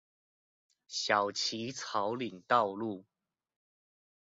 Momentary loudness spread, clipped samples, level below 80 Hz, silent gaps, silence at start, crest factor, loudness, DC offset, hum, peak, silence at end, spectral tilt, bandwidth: 11 LU; under 0.1%; -80 dBFS; none; 0.9 s; 24 dB; -33 LUFS; under 0.1%; none; -12 dBFS; 1.3 s; -1.5 dB/octave; 7.6 kHz